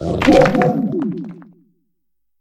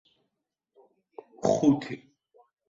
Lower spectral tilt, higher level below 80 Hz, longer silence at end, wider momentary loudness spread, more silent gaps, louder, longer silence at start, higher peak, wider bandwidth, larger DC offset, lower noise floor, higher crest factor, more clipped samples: about the same, -7 dB/octave vs -6.5 dB/octave; first, -38 dBFS vs -66 dBFS; first, 0.95 s vs 0.7 s; second, 17 LU vs 20 LU; neither; first, -15 LUFS vs -26 LUFS; second, 0 s vs 1.4 s; first, 0 dBFS vs -10 dBFS; first, 13 kHz vs 7.8 kHz; neither; second, -77 dBFS vs -83 dBFS; about the same, 18 dB vs 22 dB; neither